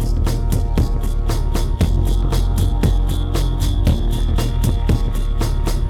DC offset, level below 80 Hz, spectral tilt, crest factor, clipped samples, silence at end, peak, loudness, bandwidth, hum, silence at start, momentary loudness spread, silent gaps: under 0.1%; -18 dBFS; -6.5 dB/octave; 12 dB; under 0.1%; 0 s; -4 dBFS; -20 LUFS; 15 kHz; none; 0 s; 4 LU; none